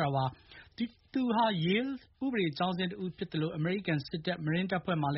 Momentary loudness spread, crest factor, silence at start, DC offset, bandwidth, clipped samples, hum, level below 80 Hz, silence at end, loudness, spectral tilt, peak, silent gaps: 10 LU; 16 dB; 0 s; under 0.1%; 5.8 kHz; under 0.1%; none; -64 dBFS; 0 s; -33 LUFS; -5 dB/octave; -16 dBFS; none